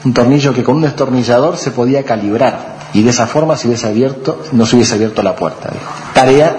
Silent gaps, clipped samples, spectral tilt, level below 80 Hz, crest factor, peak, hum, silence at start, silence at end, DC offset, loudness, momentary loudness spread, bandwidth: none; 0.1%; -5.5 dB/octave; -44 dBFS; 12 dB; 0 dBFS; none; 0 s; 0 s; under 0.1%; -12 LUFS; 9 LU; 10 kHz